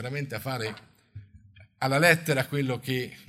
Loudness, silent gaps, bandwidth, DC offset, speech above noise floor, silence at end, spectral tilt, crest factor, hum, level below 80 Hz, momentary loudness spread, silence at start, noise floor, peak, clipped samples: -26 LUFS; none; 16 kHz; under 0.1%; 27 dB; 0.05 s; -5 dB/octave; 24 dB; none; -64 dBFS; 12 LU; 0 s; -54 dBFS; -4 dBFS; under 0.1%